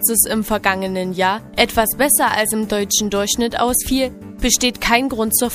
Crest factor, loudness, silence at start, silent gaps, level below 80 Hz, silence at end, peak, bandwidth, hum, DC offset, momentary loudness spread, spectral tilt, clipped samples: 18 dB; -17 LUFS; 0 s; none; -36 dBFS; 0 s; 0 dBFS; 15.5 kHz; none; under 0.1%; 6 LU; -2.5 dB/octave; under 0.1%